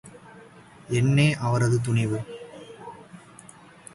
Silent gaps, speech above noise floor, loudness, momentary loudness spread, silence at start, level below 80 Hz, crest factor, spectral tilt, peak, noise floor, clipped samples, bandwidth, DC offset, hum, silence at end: none; 27 dB; -23 LUFS; 26 LU; 0.05 s; -56 dBFS; 16 dB; -6.5 dB/octave; -10 dBFS; -49 dBFS; under 0.1%; 11.5 kHz; under 0.1%; none; 0.75 s